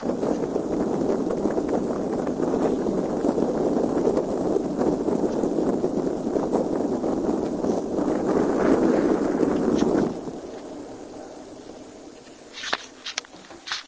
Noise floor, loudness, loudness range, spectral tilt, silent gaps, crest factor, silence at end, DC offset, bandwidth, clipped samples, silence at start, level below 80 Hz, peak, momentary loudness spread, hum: -44 dBFS; -24 LUFS; 7 LU; -6 dB/octave; none; 20 dB; 0 s; under 0.1%; 8 kHz; under 0.1%; 0 s; -50 dBFS; -4 dBFS; 18 LU; none